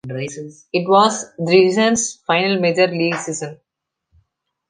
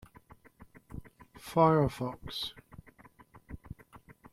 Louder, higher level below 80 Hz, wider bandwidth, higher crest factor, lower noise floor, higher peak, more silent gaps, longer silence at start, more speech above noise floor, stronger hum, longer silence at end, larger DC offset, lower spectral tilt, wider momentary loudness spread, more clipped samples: first, -17 LUFS vs -30 LUFS; second, -62 dBFS vs -56 dBFS; second, 10 kHz vs 15 kHz; second, 18 dB vs 24 dB; first, -81 dBFS vs -59 dBFS; first, -2 dBFS vs -10 dBFS; neither; second, 0.05 s vs 0.6 s; first, 63 dB vs 30 dB; neither; first, 1.15 s vs 0.75 s; neither; second, -4 dB/octave vs -7 dB/octave; second, 14 LU vs 26 LU; neither